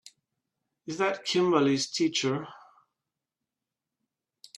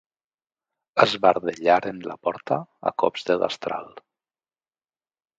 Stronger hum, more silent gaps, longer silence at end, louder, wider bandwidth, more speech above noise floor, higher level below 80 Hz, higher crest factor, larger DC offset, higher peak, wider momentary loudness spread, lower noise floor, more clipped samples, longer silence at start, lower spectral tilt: neither; neither; first, 2 s vs 1.4 s; second, -27 LUFS vs -23 LUFS; first, 12 kHz vs 9 kHz; second, 61 dB vs over 67 dB; second, -76 dBFS vs -68 dBFS; about the same, 22 dB vs 24 dB; neither; second, -10 dBFS vs 0 dBFS; first, 17 LU vs 10 LU; about the same, -88 dBFS vs under -90 dBFS; neither; about the same, 0.85 s vs 0.95 s; about the same, -4 dB/octave vs -5 dB/octave